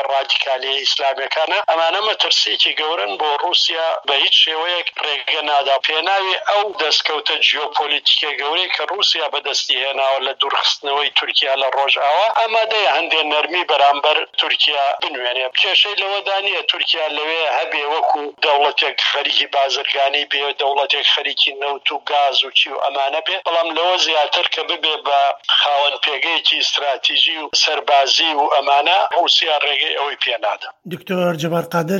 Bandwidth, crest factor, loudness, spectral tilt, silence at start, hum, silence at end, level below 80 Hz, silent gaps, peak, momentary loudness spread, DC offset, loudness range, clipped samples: 14.5 kHz; 16 dB; -16 LUFS; -2 dB/octave; 0 s; none; 0 s; -76 dBFS; none; -2 dBFS; 5 LU; under 0.1%; 2 LU; under 0.1%